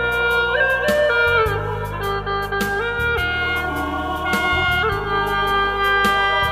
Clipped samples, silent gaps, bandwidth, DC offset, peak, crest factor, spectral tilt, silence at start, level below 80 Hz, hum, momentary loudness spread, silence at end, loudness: under 0.1%; none; 16 kHz; 0.1%; -6 dBFS; 14 dB; -4.5 dB/octave; 0 s; -34 dBFS; none; 7 LU; 0 s; -19 LUFS